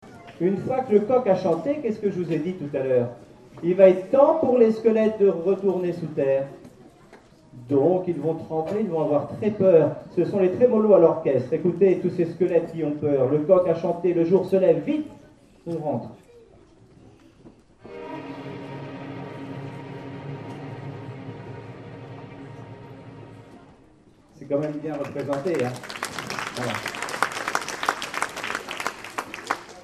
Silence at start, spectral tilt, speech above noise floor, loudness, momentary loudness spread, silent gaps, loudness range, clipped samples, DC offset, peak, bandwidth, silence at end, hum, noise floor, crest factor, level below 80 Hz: 0.05 s; -6.5 dB/octave; 33 dB; -23 LUFS; 19 LU; none; 18 LU; under 0.1%; under 0.1%; -2 dBFS; 14 kHz; 0 s; none; -54 dBFS; 22 dB; -62 dBFS